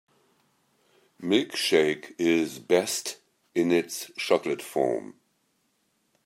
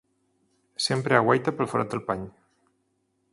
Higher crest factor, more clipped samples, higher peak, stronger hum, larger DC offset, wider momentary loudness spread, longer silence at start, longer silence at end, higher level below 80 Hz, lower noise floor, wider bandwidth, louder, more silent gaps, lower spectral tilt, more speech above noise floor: about the same, 20 dB vs 24 dB; neither; second, -8 dBFS vs -4 dBFS; neither; neither; second, 11 LU vs 14 LU; first, 1.2 s vs 0.8 s; about the same, 1.15 s vs 1.05 s; second, -74 dBFS vs -62 dBFS; about the same, -72 dBFS vs -73 dBFS; first, 16 kHz vs 11.5 kHz; about the same, -26 LUFS vs -25 LUFS; neither; second, -3.5 dB/octave vs -5 dB/octave; about the same, 46 dB vs 48 dB